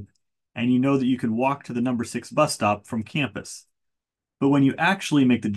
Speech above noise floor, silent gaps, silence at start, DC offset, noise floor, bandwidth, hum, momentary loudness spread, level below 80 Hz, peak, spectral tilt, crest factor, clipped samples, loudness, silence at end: 62 dB; none; 0 s; under 0.1%; -84 dBFS; 12.5 kHz; none; 9 LU; -60 dBFS; -8 dBFS; -5.5 dB/octave; 16 dB; under 0.1%; -23 LUFS; 0 s